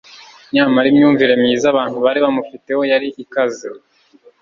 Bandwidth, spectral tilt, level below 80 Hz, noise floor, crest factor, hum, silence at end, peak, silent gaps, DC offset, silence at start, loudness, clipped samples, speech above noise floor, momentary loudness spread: 7.4 kHz; -5 dB/octave; -60 dBFS; -49 dBFS; 14 dB; none; 0.65 s; -2 dBFS; none; under 0.1%; 0.55 s; -15 LUFS; under 0.1%; 35 dB; 11 LU